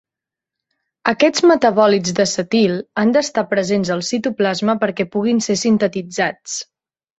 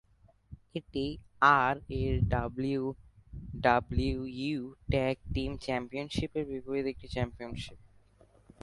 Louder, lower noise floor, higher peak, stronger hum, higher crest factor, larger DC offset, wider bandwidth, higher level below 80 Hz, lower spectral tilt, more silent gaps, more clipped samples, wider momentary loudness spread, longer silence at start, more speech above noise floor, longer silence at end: first, -17 LUFS vs -32 LUFS; first, -87 dBFS vs -62 dBFS; first, -2 dBFS vs -10 dBFS; neither; second, 16 dB vs 24 dB; neither; second, 8.2 kHz vs 11.5 kHz; second, -58 dBFS vs -44 dBFS; second, -4.5 dB/octave vs -7 dB/octave; neither; neither; second, 8 LU vs 16 LU; first, 1.05 s vs 0.5 s; first, 70 dB vs 31 dB; second, 0.55 s vs 0.75 s